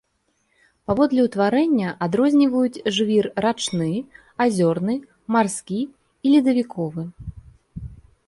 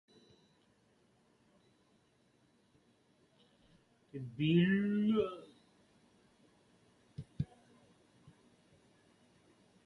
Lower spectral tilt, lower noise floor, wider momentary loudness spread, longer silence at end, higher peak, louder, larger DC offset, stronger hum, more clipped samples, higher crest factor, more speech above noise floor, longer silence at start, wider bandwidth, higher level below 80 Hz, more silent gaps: second, -5.5 dB/octave vs -8.5 dB/octave; about the same, -69 dBFS vs -72 dBFS; second, 20 LU vs 23 LU; second, 0.35 s vs 2.4 s; first, -6 dBFS vs -20 dBFS; first, -21 LUFS vs -34 LUFS; neither; neither; neither; second, 16 dB vs 22 dB; first, 49 dB vs 40 dB; second, 0.9 s vs 4.15 s; first, 11.5 kHz vs 9.8 kHz; first, -50 dBFS vs -70 dBFS; neither